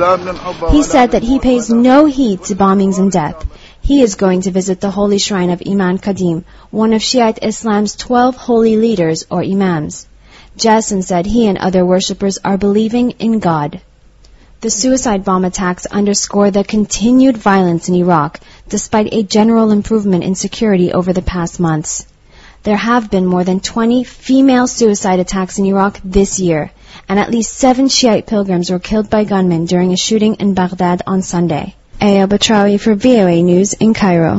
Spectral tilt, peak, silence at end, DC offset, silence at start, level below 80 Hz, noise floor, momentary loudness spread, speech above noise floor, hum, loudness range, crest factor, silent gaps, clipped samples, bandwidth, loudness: -5 dB/octave; 0 dBFS; 0 s; under 0.1%; 0 s; -32 dBFS; -42 dBFS; 7 LU; 31 dB; none; 3 LU; 12 dB; none; 0.1%; 8 kHz; -13 LUFS